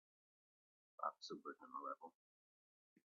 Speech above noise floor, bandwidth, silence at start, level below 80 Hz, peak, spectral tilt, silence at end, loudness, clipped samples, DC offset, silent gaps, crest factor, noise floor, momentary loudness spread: over 37 dB; 6.6 kHz; 1 s; under -90 dBFS; -30 dBFS; -2 dB/octave; 0.95 s; -51 LUFS; under 0.1%; under 0.1%; none; 26 dB; under -90 dBFS; 12 LU